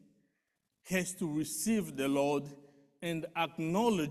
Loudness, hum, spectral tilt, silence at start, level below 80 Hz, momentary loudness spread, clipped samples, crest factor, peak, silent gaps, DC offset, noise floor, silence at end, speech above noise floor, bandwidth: -34 LUFS; none; -4.5 dB/octave; 0.85 s; -68 dBFS; 8 LU; under 0.1%; 18 dB; -16 dBFS; none; under 0.1%; -83 dBFS; 0 s; 50 dB; 14.5 kHz